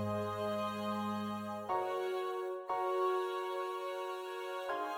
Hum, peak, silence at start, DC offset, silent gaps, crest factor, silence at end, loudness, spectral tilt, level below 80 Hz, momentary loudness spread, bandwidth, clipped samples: none; -22 dBFS; 0 s; under 0.1%; none; 16 dB; 0 s; -38 LUFS; -6 dB/octave; -78 dBFS; 7 LU; 17 kHz; under 0.1%